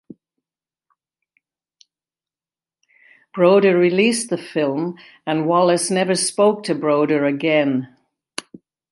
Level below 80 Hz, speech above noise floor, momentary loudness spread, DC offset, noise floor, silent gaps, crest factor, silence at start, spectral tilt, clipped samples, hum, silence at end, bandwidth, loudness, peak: -72 dBFS; over 73 dB; 18 LU; under 0.1%; under -90 dBFS; none; 18 dB; 3.35 s; -4.5 dB/octave; under 0.1%; none; 1.05 s; 11.5 kHz; -18 LUFS; -2 dBFS